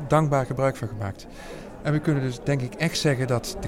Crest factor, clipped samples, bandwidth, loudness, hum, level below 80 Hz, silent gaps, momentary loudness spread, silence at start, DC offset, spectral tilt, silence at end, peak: 20 dB; under 0.1%; 16 kHz; -25 LUFS; none; -46 dBFS; none; 16 LU; 0 s; under 0.1%; -6 dB/octave; 0 s; -6 dBFS